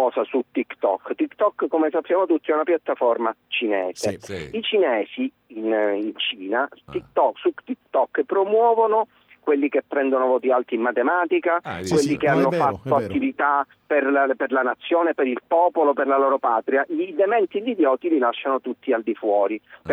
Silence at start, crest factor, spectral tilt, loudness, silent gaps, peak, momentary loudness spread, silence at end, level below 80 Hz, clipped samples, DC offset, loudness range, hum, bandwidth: 0 s; 14 dB; -5.5 dB/octave; -22 LUFS; none; -8 dBFS; 7 LU; 0 s; -62 dBFS; under 0.1%; under 0.1%; 3 LU; none; 13 kHz